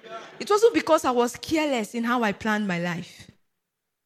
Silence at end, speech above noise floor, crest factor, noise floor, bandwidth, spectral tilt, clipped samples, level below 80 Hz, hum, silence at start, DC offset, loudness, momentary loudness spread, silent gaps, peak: 0.8 s; 57 dB; 18 dB; -81 dBFS; 15 kHz; -4.5 dB/octave; under 0.1%; -62 dBFS; none; 0.05 s; under 0.1%; -24 LUFS; 15 LU; none; -6 dBFS